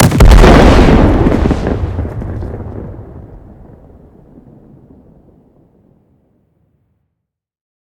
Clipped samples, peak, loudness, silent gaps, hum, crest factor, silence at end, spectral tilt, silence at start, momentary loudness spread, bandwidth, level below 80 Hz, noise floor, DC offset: 4%; 0 dBFS; -9 LUFS; none; none; 12 dB; 4.45 s; -6.5 dB/octave; 0 s; 23 LU; 17.5 kHz; -14 dBFS; -75 dBFS; under 0.1%